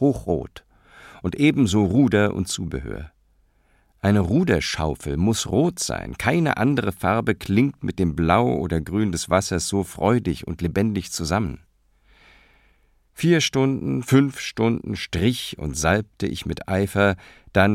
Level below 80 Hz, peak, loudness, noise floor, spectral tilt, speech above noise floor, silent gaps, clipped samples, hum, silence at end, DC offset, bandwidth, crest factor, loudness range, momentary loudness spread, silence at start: -42 dBFS; -2 dBFS; -22 LUFS; -61 dBFS; -5.5 dB/octave; 40 dB; none; under 0.1%; none; 0 s; under 0.1%; 16 kHz; 20 dB; 3 LU; 9 LU; 0 s